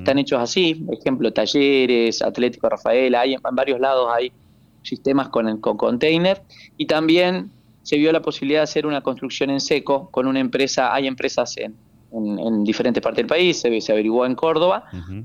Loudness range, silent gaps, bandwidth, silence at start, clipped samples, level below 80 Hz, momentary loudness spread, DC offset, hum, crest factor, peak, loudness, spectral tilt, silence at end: 3 LU; none; 10 kHz; 0 s; under 0.1%; -56 dBFS; 9 LU; under 0.1%; none; 14 dB; -6 dBFS; -20 LUFS; -4.5 dB/octave; 0 s